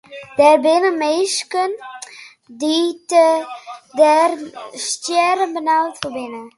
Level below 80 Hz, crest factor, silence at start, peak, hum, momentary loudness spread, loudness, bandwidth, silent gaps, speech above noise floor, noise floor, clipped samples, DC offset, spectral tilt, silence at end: -66 dBFS; 18 dB; 0.1 s; 0 dBFS; none; 18 LU; -16 LUFS; 11.5 kHz; none; 22 dB; -39 dBFS; under 0.1%; under 0.1%; -2 dB/octave; 0.1 s